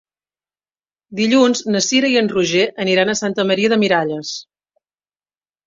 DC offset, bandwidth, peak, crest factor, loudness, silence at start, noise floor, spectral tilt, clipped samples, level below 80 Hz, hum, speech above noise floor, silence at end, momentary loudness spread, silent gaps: under 0.1%; 7.8 kHz; -2 dBFS; 16 dB; -16 LUFS; 1.1 s; under -90 dBFS; -3.5 dB/octave; under 0.1%; -60 dBFS; 50 Hz at -60 dBFS; over 74 dB; 1.25 s; 10 LU; none